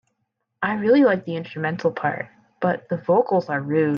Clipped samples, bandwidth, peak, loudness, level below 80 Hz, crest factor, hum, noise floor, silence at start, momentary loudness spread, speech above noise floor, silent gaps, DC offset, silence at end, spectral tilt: under 0.1%; 6.8 kHz; -6 dBFS; -22 LUFS; -66 dBFS; 16 dB; none; -76 dBFS; 0.6 s; 11 LU; 55 dB; none; under 0.1%; 0 s; -8.5 dB/octave